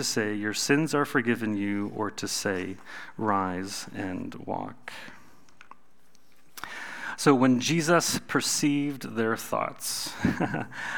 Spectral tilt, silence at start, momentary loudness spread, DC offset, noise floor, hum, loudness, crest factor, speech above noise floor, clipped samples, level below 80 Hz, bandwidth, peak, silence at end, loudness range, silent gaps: -4 dB/octave; 0 s; 16 LU; 0.5%; -64 dBFS; none; -27 LUFS; 22 dB; 37 dB; under 0.1%; -60 dBFS; over 20 kHz; -6 dBFS; 0 s; 12 LU; none